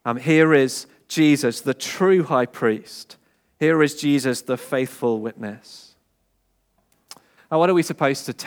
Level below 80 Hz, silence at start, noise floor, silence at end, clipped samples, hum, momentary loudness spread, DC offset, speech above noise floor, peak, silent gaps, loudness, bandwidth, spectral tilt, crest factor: -74 dBFS; 0.05 s; -68 dBFS; 0 s; under 0.1%; none; 14 LU; under 0.1%; 48 dB; -4 dBFS; none; -20 LUFS; 19.5 kHz; -5.5 dB/octave; 18 dB